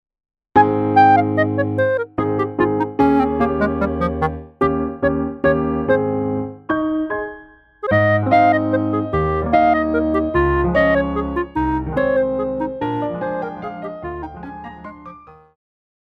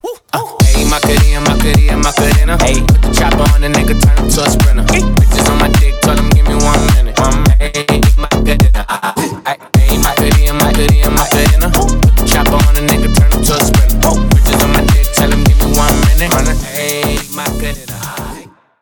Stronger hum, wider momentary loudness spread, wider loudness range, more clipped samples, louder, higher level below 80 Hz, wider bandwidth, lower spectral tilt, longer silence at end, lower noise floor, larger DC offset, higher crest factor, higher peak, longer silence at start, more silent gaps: neither; first, 14 LU vs 7 LU; first, 7 LU vs 2 LU; neither; second, -18 LUFS vs -11 LUFS; second, -36 dBFS vs -12 dBFS; second, 6 kHz vs 20 kHz; first, -9 dB/octave vs -4.5 dB/octave; first, 0.85 s vs 0.4 s; first, -43 dBFS vs -32 dBFS; neither; first, 18 dB vs 8 dB; about the same, -2 dBFS vs 0 dBFS; first, 0.55 s vs 0.05 s; neither